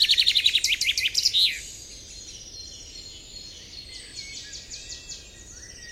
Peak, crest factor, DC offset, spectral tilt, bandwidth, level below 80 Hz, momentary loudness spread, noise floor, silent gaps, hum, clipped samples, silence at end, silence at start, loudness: -6 dBFS; 22 dB; under 0.1%; 1.5 dB/octave; 16 kHz; -52 dBFS; 21 LU; -44 dBFS; none; none; under 0.1%; 0 s; 0 s; -20 LUFS